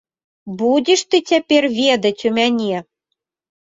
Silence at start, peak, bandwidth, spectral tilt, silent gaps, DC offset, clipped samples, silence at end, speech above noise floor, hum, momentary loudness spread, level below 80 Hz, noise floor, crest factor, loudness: 0.45 s; -2 dBFS; 7.8 kHz; -3.5 dB/octave; none; under 0.1%; under 0.1%; 0.8 s; 62 dB; none; 8 LU; -62 dBFS; -77 dBFS; 16 dB; -16 LUFS